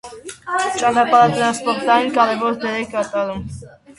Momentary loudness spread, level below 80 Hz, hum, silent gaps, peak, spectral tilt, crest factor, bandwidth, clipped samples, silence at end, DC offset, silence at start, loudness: 18 LU; -50 dBFS; none; none; 0 dBFS; -4 dB/octave; 18 dB; 11.5 kHz; under 0.1%; 0.3 s; under 0.1%; 0.05 s; -17 LUFS